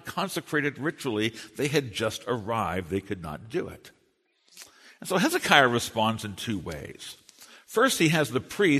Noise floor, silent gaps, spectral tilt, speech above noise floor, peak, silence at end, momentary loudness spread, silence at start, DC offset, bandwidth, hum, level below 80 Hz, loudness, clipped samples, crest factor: -69 dBFS; none; -4 dB/octave; 42 dB; -2 dBFS; 0 s; 17 LU; 0.05 s; under 0.1%; 13.5 kHz; none; -58 dBFS; -26 LUFS; under 0.1%; 26 dB